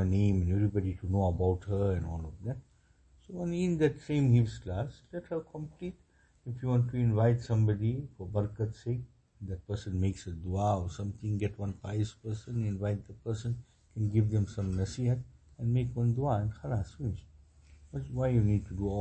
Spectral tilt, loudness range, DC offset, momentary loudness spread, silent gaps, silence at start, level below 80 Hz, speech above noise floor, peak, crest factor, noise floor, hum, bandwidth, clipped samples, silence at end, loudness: -8.5 dB/octave; 4 LU; under 0.1%; 14 LU; none; 0 s; -50 dBFS; 32 dB; -16 dBFS; 16 dB; -63 dBFS; none; 8.6 kHz; under 0.1%; 0 s; -32 LUFS